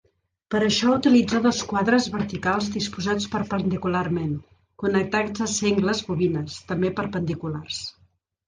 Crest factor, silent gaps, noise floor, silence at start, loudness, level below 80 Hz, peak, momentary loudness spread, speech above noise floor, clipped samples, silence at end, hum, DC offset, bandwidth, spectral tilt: 16 dB; none; -63 dBFS; 0.5 s; -24 LUFS; -52 dBFS; -6 dBFS; 11 LU; 40 dB; under 0.1%; 0.6 s; none; under 0.1%; 10 kHz; -5 dB/octave